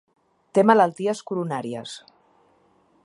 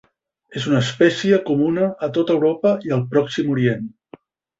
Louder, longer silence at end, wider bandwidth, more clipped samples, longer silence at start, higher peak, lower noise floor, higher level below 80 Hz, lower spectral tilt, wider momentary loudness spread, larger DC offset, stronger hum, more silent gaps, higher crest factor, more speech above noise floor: second, -22 LUFS vs -19 LUFS; first, 1.05 s vs 0.7 s; first, 11.5 kHz vs 8 kHz; neither; about the same, 0.55 s vs 0.5 s; about the same, -2 dBFS vs -2 dBFS; first, -61 dBFS vs -47 dBFS; second, -76 dBFS vs -58 dBFS; about the same, -6 dB/octave vs -6.5 dB/octave; first, 18 LU vs 7 LU; neither; neither; neither; about the same, 22 dB vs 18 dB; first, 40 dB vs 28 dB